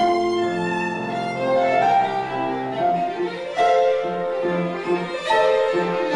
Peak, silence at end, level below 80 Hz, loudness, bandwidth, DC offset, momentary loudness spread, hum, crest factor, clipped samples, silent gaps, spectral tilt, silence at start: -8 dBFS; 0 s; -60 dBFS; -21 LUFS; 11.5 kHz; under 0.1%; 7 LU; none; 12 dB; under 0.1%; none; -5.5 dB/octave; 0 s